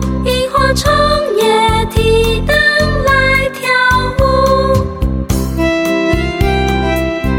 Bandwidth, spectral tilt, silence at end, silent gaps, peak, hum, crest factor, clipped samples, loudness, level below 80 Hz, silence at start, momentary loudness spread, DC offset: 17 kHz; -5 dB/octave; 0 s; none; 0 dBFS; none; 12 dB; under 0.1%; -12 LUFS; -20 dBFS; 0 s; 5 LU; under 0.1%